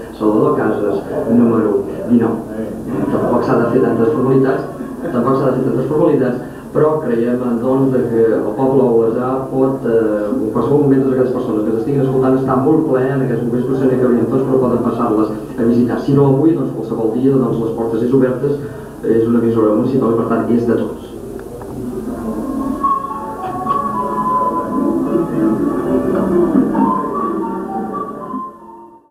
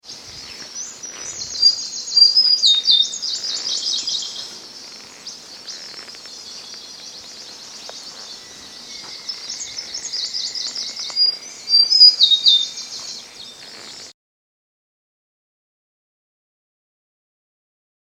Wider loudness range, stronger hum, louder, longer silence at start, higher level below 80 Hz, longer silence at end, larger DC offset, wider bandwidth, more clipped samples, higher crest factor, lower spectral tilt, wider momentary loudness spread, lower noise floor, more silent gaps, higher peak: second, 3 LU vs 20 LU; neither; about the same, -15 LUFS vs -14 LUFS; about the same, 0 s vs 0.05 s; first, -44 dBFS vs -66 dBFS; second, 0.25 s vs 4.05 s; neither; second, 14.5 kHz vs 17 kHz; neither; second, 14 dB vs 22 dB; first, -9 dB/octave vs 2 dB/octave; second, 10 LU vs 24 LU; about the same, -38 dBFS vs -38 dBFS; neither; about the same, 0 dBFS vs 0 dBFS